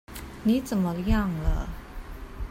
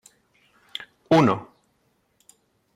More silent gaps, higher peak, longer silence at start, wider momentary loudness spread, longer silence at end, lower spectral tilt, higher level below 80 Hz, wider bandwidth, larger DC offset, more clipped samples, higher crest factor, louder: neither; about the same, -10 dBFS vs -8 dBFS; second, 0.1 s vs 1.1 s; about the same, 17 LU vs 19 LU; second, 0 s vs 1.3 s; about the same, -7 dB/octave vs -6.5 dB/octave; first, -32 dBFS vs -66 dBFS; first, 16 kHz vs 13.5 kHz; neither; neither; about the same, 18 dB vs 20 dB; second, -27 LUFS vs -21 LUFS